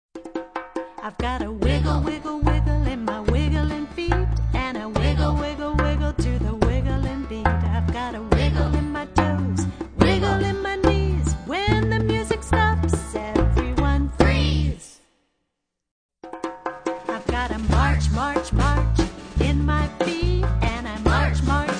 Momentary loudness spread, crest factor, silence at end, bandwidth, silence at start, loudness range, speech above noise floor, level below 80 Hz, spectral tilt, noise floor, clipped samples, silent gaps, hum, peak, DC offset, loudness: 8 LU; 20 dB; 0 s; 10 kHz; 0.15 s; 3 LU; 56 dB; -26 dBFS; -6.5 dB/octave; -79 dBFS; under 0.1%; 15.91-16.09 s; none; -2 dBFS; under 0.1%; -23 LUFS